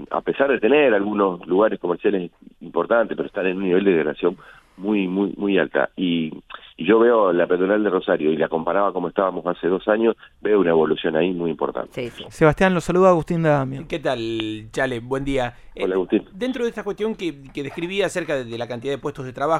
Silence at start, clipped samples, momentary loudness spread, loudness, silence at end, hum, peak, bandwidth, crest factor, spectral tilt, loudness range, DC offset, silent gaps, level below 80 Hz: 0 s; under 0.1%; 11 LU; -21 LUFS; 0 s; none; -2 dBFS; 12 kHz; 20 dB; -6.5 dB/octave; 5 LU; under 0.1%; none; -48 dBFS